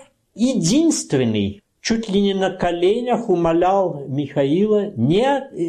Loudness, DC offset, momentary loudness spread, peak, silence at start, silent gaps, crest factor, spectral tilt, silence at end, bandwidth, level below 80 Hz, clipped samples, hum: -19 LUFS; under 0.1%; 6 LU; -8 dBFS; 0.35 s; none; 12 dB; -5.5 dB/octave; 0 s; 13 kHz; -48 dBFS; under 0.1%; none